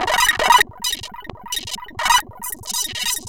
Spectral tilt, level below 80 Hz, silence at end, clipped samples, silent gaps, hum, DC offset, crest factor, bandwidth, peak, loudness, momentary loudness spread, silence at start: 0 dB/octave; -44 dBFS; 0 s; under 0.1%; none; none; 0.6%; 20 dB; 17 kHz; 0 dBFS; -18 LUFS; 15 LU; 0 s